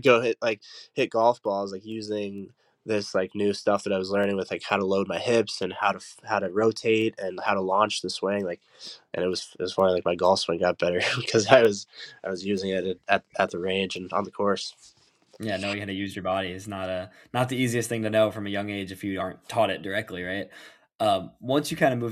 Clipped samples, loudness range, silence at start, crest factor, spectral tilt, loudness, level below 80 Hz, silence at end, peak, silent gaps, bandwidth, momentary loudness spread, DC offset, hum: under 0.1%; 6 LU; 0 s; 26 dB; -4.5 dB/octave; -26 LUFS; -68 dBFS; 0 s; -2 dBFS; 20.95-20.99 s; 15 kHz; 11 LU; under 0.1%; none